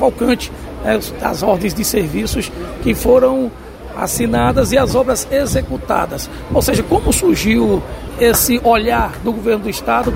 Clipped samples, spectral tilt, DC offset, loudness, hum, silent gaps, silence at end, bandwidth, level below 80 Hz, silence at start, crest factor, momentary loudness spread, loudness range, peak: under 0.1%; -4.5 dB/octave; under 0.1%; -15 LUFS; none; none; 0 s; 16.5 kHz; -28 dBFS; 0 s; 14 dB; 10 LU; 2 LU; 0 dBFS